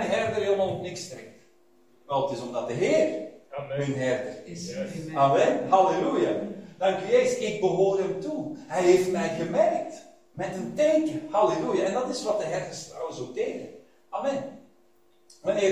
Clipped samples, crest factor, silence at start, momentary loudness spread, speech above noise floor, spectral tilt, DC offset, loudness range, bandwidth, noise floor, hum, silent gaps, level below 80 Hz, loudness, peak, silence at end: under 0.1%; 18 dB; 0 s; 16 LU; 38 dB; -5.5 dB/octave; under 0.1%; 6 LU; 15 kHz; -64 dBFS; none; none; -64 dBFS; -26 LUFS; -8 dBFS; 0 s